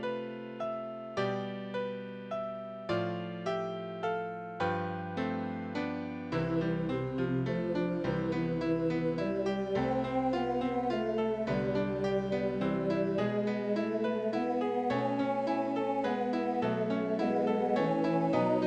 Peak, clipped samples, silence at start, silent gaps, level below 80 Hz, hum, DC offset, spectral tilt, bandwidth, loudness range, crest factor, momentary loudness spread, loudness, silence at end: -16 dBFS; under 0.1%; 0 s; none; -60 dBFS; none; under 0.1%; -8 dB/octave; 9 kHz; 5 LU; 16 dB; 7 LU; -33 LUFS; 0 s